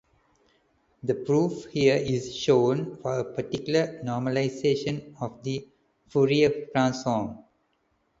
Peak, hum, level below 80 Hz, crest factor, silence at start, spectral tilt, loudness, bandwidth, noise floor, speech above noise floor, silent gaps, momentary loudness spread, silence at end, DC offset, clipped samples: -8 dBFS; none; -60 dBFS; 20 dB; 1.05 s; -6 dB/octave; -26 LUFS; 7.8 kHz; -71 dBFS; 46 dB; none; 11 LU; 0.8 s; under 0.1%; under 0.1%